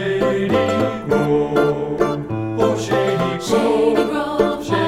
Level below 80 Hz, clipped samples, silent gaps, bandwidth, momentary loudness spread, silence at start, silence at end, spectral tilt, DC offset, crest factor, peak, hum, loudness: -44 dBFS; under 0.1%; none; 15.5 kHz; 4 LU; 0 s; 0 s; -6 dB/octave; under 0.1%; 16 dB; -2 dBFS; none; -18 LUFS